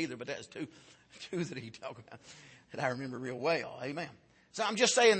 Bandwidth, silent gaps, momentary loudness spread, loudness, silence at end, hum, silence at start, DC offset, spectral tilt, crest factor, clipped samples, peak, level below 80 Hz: 8.8 kHz; none; 21 LU; -35 LUFS; 0 s; none; 0 s; under 0.1%; -3 dB/octave; 22 dB; under 0.1%; -12 dBFS; -78 dBFS